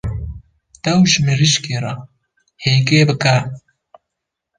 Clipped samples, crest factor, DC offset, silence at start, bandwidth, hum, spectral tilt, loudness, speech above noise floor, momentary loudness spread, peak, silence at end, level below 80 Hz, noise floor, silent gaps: under 0.1%; 16 dB; under 0.1%; 0.05 s; 10 kHz; none; -4.5 dB/octave; -15 LUFS; 65 dB; 17 LU; -2 dBFS; 1 s; -38 dBFS; -79 dBFS; none